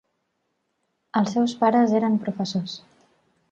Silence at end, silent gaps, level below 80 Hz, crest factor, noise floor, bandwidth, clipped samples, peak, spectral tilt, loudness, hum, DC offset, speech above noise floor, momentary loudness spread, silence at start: 0.75 s; none; -70 dBFS; 18 dB; -75 dBFS; 8 kHz; under 0.1%; -6 dBFS; -6.5 dB/octave; -22 LUFS; none; under 0.1%; 53 dB; 11 LU; 1.15 s